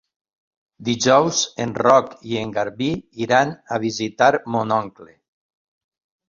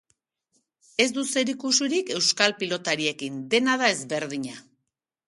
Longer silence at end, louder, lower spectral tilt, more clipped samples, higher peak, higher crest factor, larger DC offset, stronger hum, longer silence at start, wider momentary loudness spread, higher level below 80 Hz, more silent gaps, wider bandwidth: first, 1.25 s vs 0.65 s; first, -20 LUFS vs -24 LUFS; first, -4 dB/octave vs -2 dB/octave; neither; about the same, -2 dBFS vs -2 dBFS; about the same, 20 dB vs 24 dB; neither; neither; second, 0.8 s vs 1 s; about the same, 11 LU vs 12 LU; first, -58 dBFS vs -74 dBFS; neither; second, 7.6 kHz vs 11.5 kHz